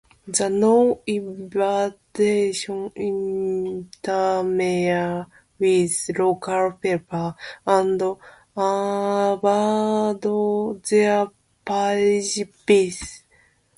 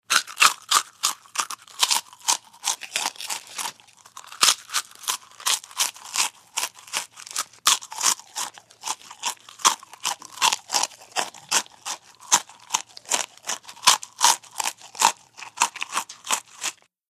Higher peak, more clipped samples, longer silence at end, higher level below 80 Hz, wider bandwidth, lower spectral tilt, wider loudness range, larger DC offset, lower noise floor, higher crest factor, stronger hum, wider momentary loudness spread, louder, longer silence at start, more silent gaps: second, -4 dBFS vs 0 dBFS; neither; first, 0.6 s vs 0.4 s; first, -58 dBFS vs -78 dBFS; second, 11.5 kHz vs 15.5 kHz; first, -4.5 dB/octave vs 2.5 dB/octave; about the same, 2 LU vs 3 LU; neither; first, -59 dBFS vs -47 dBFS; second, 18 dB vs 26 dB; neither; second, 10 LU vs 13 LU; about the same, -22 LUFS vs -24 LUFS; first, 0.25 s vs 0.1 s; neither